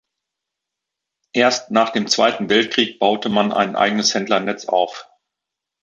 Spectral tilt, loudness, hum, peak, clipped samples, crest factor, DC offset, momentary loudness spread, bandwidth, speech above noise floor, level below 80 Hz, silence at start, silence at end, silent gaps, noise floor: -3 dB/octave; -18 LUFS; none; -2 dBFS; under 0.1%; 18 dB; under 0.1%; 4 LU; 8.2 kHz; 66 dB; -64 dBFS; 1.35 s; 0.8 s; none; -83 dBFS